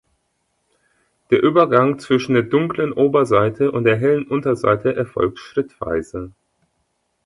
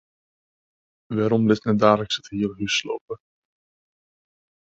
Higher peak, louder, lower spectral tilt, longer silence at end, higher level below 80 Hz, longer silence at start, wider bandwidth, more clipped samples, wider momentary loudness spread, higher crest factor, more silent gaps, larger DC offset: about the same, 0 dBFS vs -2 dBFS; first, -18 LUFS vs -22 LUFS; first, -7.5 dB/octave vs -5.5 dB/octave; second, 0.95 s vs 1.55 s; first, -50 dBFS vs -58 dBFS; first, 1.3 s vs 1.1 s; first, 11.5 kHz vs 8 kHz; neither; second, 10 LU vs 14 LU; second, 18 dB vs 24 dB; second, none vs 3.01-3.08 s; neither